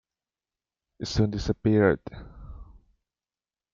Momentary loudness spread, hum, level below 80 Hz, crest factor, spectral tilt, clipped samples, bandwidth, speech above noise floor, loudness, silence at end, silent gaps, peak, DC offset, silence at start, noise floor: 24 LU; none; -46 dBFS; 22 dB; -7 dB/octave; under 0.1%; 7.4 kHz; over 65 dB; -25 LUFS; 1.1 s; none; -8 dBFS; under 0.1%; 1 s; under -90 dBFS